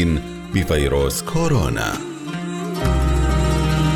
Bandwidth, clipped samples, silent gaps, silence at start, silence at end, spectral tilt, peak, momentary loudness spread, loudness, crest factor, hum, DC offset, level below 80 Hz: 19 kHz; under 0.1%; none; 0 s; 0 s; -5.5 dB/octave; -6 dBFS; 8 LU; -20 LUFS; 14 dB; none; under 0.1%; -24 dBFS